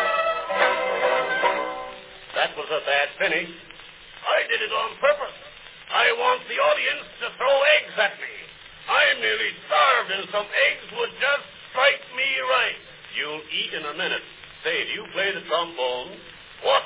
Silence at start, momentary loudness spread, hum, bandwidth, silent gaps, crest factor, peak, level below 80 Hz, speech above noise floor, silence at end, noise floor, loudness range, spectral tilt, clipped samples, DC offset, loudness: 0 s; 17 LU; none; 4 kHz; none; 20 dB; -4 dBFS; -64 dBFS; 21 dB; 0 s; -44 dBFS; 5 LU; -5 dB/octave; under 0.1%; under 0.1%; -23 LUFS